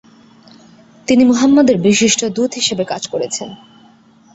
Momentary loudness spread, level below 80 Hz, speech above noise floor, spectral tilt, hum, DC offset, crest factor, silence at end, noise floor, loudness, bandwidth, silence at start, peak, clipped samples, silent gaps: 12 LU; -54 dBFS; 34 dB; -3.5 dB/octave; none; under 0.1%; 14 dB; 0.8 s; -47 dBFS; -14 LUFS; 8.2 kHz; 1.1 s; 0 dBFS; under 0.1%; none